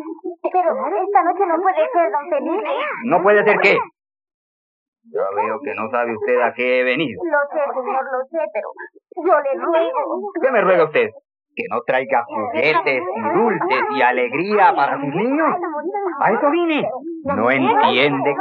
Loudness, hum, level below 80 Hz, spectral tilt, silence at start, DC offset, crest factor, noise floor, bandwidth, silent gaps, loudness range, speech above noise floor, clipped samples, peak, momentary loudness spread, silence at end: -18 LUFS; none; -74 dBFS; -7 dB/octave; 0 s; under 0.1%; 16 dB; under -90 dBFS; 7.4 kHz; 4.34-4.93 s; 3 LU; over 72 dB; under 0.1%; -2 dBFS; 10 LU; 0 s